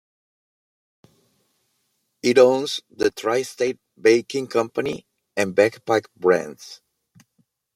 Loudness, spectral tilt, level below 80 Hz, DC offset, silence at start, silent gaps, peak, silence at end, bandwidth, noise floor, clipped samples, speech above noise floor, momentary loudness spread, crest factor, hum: -21 LUFS; -4.5 dB/octave; -66 dBFS; under 0.1%; 2.25 s; none; -2 dBFS; 1 s; 15.5 kHz; -72 dBFS; under 0.1%; 51 dB; 14 LU; 20 dB; none